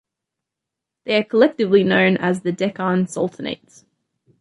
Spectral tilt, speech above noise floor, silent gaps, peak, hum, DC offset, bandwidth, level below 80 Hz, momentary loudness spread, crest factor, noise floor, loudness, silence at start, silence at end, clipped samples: -6 dB/octave; 65 dB; none; -2 dBFS; none; under 0.1%; 11.5 kHz; -64 dBFS; 14 LU; 18 dB; -84 dBFS; -19 LUFS; 1.05 s; 0.85 s; under 0.1%